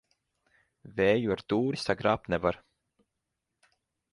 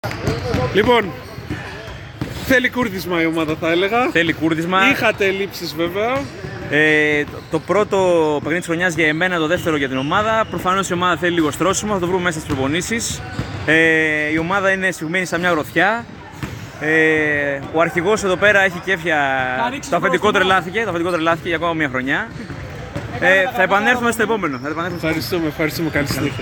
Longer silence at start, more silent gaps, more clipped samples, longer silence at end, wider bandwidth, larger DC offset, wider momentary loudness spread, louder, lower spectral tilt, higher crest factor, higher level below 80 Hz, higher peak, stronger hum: first, 0.85 s vs 0.05 s; neither; neither; first, 1.55 s vs 0 s; second, 11.5 kHz vs 18 kHz; neither; second, 7 LU vs 13 LU; second, -29 LUFS vs -17 LUFS; first, -6.5 dB/octave vs -4.5 dB/octave; about the same, 22 dB vs 18 dB; second, -58 dBFS vs -42 dBFS; second, -10 dBFS vs 0 dBFS; neither